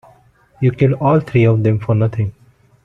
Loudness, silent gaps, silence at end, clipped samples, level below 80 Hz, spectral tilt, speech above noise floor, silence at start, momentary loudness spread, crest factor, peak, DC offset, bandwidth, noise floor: -16 LUFS; none; 0.55 s; under 0.1%; -46 dBFS; -10 dB/octave; 37 dB; 0.6 s; 6 LU; 14 dB; -2 dBFS; under 0.1%; 4.3 kHz; -50 dBFS